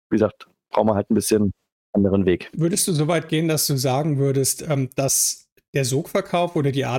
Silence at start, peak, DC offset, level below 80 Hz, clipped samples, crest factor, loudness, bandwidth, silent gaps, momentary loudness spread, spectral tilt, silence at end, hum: 0.1 s; -4 dBFS; under 0.1%; -54 dBFS; under 0.1%; 16 dB; -21 LUFS; 17 kHz; 1.72-1.93 s, 5.52-5.56 s, 5.68-5.73 s; 5 LU; -4.5 dB/octave; 0 s; none